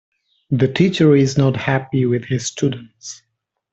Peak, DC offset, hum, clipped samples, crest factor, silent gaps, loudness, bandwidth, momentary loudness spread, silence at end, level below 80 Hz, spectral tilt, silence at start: -2 dBFS; under 0.1%; none; under 0.1%; 16 dB; none; -17 LUFS; 8.2 kHz; 20 LU; 0.6 s; -52 dBFS; -6 dB/octave; 0.5 s